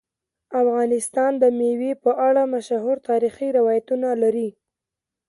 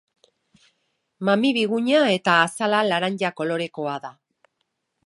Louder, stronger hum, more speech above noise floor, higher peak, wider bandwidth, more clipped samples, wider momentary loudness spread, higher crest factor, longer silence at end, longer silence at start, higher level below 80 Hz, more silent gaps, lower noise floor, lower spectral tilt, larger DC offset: about the same, -21 LUFS vs -21 LUFS; neither; first, 67 dB vs 55 dB; about the same, -6 dBFS vs -4 dBFS; about the same, 11.5 kHz vs 11.5 kHz; neither; second, 5 LU vs 11 LU; about the same, 16 dB vs 20 dB; second, 0.8 s vs 0.95 s; second, 0.5 s vs 1.2 s; first, -70 dBFS vs -76 dBFS; neither; first, -87 dBFS vs -76 dBFS; about the same, -5 dB/octave vs -4.5 dB/octave; neither